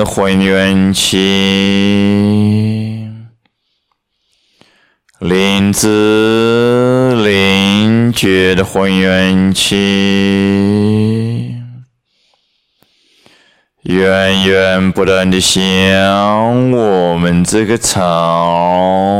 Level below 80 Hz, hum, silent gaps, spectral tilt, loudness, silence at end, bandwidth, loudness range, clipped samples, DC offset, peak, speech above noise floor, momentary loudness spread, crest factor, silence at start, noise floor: -42 dBFS; none; none; -5 dB/octave; -11 LUFS; 0 s; 16 kHz; 7 LU; under 0.1%; under 0.1%; 0 dBFS; 55 dB; 4 LU; 12 dB; 0 s; -65 dBFS